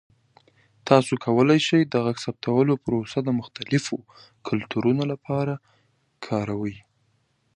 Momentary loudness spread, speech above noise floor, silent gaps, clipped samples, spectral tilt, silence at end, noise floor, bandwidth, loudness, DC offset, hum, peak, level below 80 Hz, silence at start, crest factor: 14 LU; 45 dB; none; under 0.1%; -6.5 dB/octave; 0.75 s; -68 dBFS; 11 kHz; -24 LUFS; under 0.1%; none; -2 dBFS; -60 dBFS; 0.85 s; 24 dB